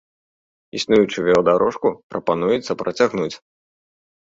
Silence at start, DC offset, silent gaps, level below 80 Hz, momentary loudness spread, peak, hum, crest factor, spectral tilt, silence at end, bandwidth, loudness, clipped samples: 0.75 s; under 0.1%; 2.03-2.10 s; -56 dBFS; 11 LU; -2 dBFS; none; 18 dB; -5.5 dB/octave; 0.85 s; 7.8 kHz; -19 LUFS; under 0.1%